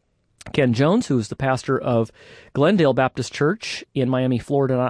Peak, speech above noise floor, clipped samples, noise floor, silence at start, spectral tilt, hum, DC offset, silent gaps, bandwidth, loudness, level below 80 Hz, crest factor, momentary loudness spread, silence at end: -6 dBFS; 24 dB; under 0.1%; -44 dBFS; 0.45 s; -6.5 dB/octave; none; under 0.1%; none; 10.5 kHz; -21 LUFS; -54 dBFS; 16 dB; 9 LU; 0 s